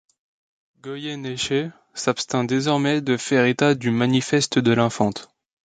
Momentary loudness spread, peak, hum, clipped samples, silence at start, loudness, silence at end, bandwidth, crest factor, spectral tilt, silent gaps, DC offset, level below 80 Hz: 12 LU; -4 dBFS; none; under 0.1%; 0.85 s; -21 LUFS; 0.45 s; 9.6 kHz; 18 dB; -5 dB/octave; none; under 0.1%; -60 dBFS